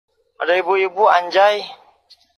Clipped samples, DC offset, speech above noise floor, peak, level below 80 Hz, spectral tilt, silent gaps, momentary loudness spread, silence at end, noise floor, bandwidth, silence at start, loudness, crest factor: under 0.1%; under 0.1%; 37 dB; -2 dBFS; -76 dBFS; -3 dB/octave; none; 11 LU; 0.65 s; -53 dBFS; 13 kHz; 0.4 s; -16 LUFS; 16 dB